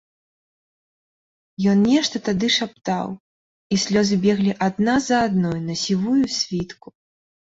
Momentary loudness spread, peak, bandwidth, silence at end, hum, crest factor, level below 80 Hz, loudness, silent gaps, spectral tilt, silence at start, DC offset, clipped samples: 8 LU; -6 dBFS; 8 kHz; 0.85 s; none; 16 dB; -54 dBFS; -20 LUFS; 3.20-3.70 s; -5 dB/octave; 1.6 s; under 0.1%; under 0.1%